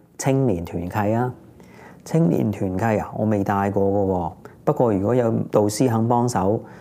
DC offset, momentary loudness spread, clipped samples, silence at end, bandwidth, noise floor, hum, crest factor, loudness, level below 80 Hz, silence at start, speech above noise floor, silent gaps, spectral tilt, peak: under 0.1%; 7 LU; under 0.1%; 0 s; 16 kHz; -44 dBFS; none; 18 dB; -21 LUFS; -56 dBFS; 0.2 s; 24 dB; none; -7 dB/octave; -4 dBFS